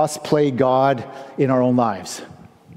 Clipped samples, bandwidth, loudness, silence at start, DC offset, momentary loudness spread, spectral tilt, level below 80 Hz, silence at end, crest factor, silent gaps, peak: under 0.1%; 15.5 kHz; -19 LUFS; 0 s; under 0.1%; 15 LU; -6 dB/octave; -60 dBFS; 0.05 s; 16 dB; none; -4 dBFS